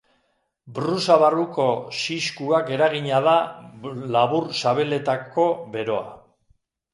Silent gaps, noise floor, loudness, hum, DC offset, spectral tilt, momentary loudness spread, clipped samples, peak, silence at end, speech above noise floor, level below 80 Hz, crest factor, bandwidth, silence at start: none; -70 dBFS; -22 LUFS; none; under 0.1%; -5 dB/octave; 12 LU; under 0.1%; -2 dBFS; 0.75 s; 48 dB; -68 dBFS; 20 dB; 11.5 kHz; 0.65 s